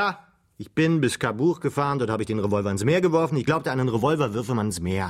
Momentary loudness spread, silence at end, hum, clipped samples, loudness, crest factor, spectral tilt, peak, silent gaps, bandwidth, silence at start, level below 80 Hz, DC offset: 5 LU; 0 s; none; under 0.1%; -24 LUFS; 16 dB; -6 dB/octave; -8 dBFS; none; 15.5 kHz; 0 s; -56 dBFS; under 0.1%